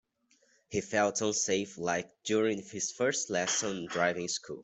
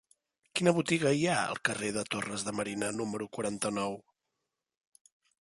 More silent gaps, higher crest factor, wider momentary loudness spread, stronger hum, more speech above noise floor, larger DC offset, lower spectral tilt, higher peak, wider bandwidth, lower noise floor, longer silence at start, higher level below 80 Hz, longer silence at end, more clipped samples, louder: neither; about the same, 20 dB vs 22 dB; second, 6 LU vs 9 LU; neither; second, 38 dB vs 55 dB; neither; second, -2.5 dB/octave vs -4 dB/octave; about the same, -12 dBFS vs -12 dBFS; second, 8.2 kHz vs 12 kHz; second, -70 dBFS vs -86 dBFS; first, 0.7 s vs 0.55 s; about the same, -72 dBFS vs -70 dBFS; second, 0 s vs 1.5 s; neither; about the same, -31 LUFS vs -32 LUFS